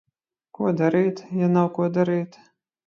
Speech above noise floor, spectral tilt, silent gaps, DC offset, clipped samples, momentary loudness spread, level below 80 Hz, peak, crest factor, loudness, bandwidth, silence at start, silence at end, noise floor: 33 dB; -9 dB/octave; none; under 0.1%; under 0.1%; 7 LU; -70 dBFS; -8 dBFS; 16 dB; -22 LUFS; 6.8 kHz; 0.6 s; 0.6 s; -54 dBFS